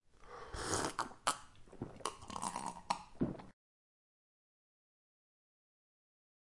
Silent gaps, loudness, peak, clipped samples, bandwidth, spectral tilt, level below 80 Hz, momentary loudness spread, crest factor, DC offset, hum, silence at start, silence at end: none; -42 LUFS; -18 dBFS; under 0.1%; 11.5 kHz; -3 dB/octave; -62 dBFS; 15 LU; 28 dB; under 0.1%; none; 0.15 s; 2.95 s